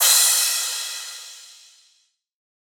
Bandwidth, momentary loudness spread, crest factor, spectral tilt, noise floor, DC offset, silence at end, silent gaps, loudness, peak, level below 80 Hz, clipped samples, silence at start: over 20 kHz; 24 LU; 20 dB; 10 dB/octave; -64 dBFS; under 0.1%; 1.3 s; none; -18 LUFS; -4 dBFS; under -90 dBFS; under 0.1%; 0 s